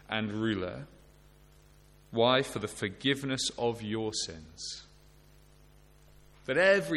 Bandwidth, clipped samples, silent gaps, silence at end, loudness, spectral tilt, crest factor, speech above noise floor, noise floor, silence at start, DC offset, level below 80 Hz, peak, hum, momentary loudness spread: 14.5 kHz; under 0.1%; none; 0 s; -31 LUFS; -4 dB/octave; 20 dB; 28 dB; -59 dBFS; 0.1 s; under 0.1%; -60 dBFS; -12 dBFS; 50 Hz at -60 dBFS; 15 LU